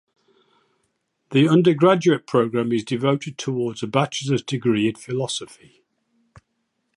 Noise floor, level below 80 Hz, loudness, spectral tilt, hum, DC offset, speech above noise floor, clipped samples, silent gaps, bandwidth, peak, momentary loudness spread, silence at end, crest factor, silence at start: -73 dBFS; -66 dBFS; -21 LUFS; -6 dB/octave; none; under 0.1%; 53 dB; under 0.1%; none; 11.5 kHz; -4 dBFS; 10 LU; 1.5 s; 20 dB; 1.3 s